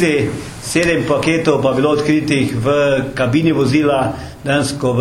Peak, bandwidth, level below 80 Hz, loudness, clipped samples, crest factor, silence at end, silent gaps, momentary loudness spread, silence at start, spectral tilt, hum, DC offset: 0 dBFS; 15.5 kHz; -42 dBFS; -15 LUFS; under 0.1%; 14 dB; 0 s; none; 5 LU; 0 s; -5.5 dB/octave; none; under 0.1%